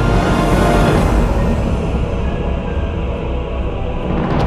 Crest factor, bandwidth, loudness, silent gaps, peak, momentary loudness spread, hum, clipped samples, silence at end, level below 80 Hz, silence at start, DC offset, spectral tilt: 12 dB; 14 kHz; -17 LUFS; none; -2 dBFS; 9 LU; none; under 0.1%; 0 s; -20 dBFS; 0 s; under 0.1%; -7 dB/octave